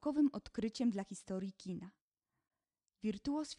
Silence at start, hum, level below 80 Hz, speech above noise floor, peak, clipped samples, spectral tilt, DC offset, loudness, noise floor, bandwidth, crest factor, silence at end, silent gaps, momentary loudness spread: 0 s; none; -68 dBFS; over 51 dB; -24 dBFS; under 0.1%; -6 dB/octave; under 0.1%; -40 LUFS; under -90 dBFS; 11 kHz; 16 dB; 0.05 s; 2.01-2.11 s; 12 LU